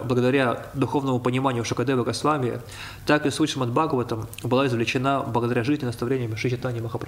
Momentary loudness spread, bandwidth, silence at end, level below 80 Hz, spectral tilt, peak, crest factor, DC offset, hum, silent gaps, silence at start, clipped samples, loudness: 7 LU; 16 kHz; 0 s; -52 dBFS; -6 dB/octave; -8 dBFS; 16 dB; under 0.1%; none; none; 0 s; under 0.1%; -24 LUFS